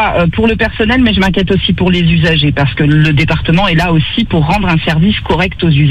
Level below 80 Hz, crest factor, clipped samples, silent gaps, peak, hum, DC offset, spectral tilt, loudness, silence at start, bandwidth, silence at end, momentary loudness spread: -24 dBFS; 10 dB; under 0.1%; none; 0 dBFS; none; under 0.1%; -7 dB/octave; -10 LUFS; 0 s; 8.6 kHz; 0 s; 3 LU